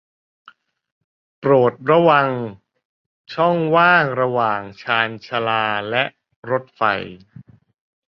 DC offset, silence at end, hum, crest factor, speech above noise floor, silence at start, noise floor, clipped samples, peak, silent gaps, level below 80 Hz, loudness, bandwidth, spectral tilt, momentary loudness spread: under 0.1%; 1.05 s; none; 18 dB; 27 dB; 1.4 s; -45 dBFS; under 0.1%; -2 dBFS; 2.85-3.25 s, 6.36-6.43 s; -62 dBFS; -18 LUFS; 6 kHz; -7.5 dB/octave; 12 LU